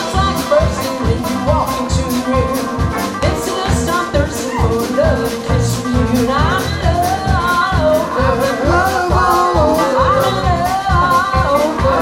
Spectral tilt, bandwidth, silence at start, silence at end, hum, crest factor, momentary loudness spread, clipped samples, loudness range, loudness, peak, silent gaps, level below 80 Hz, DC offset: -5.5 dB/octave; 16.5 kHz; 0 s; 0 s; none; 14 dB; 5 LU; under 0.1%; 3 LU; -15 LUFS; 0 dBFS; none; -24 dBFS; under 0.1%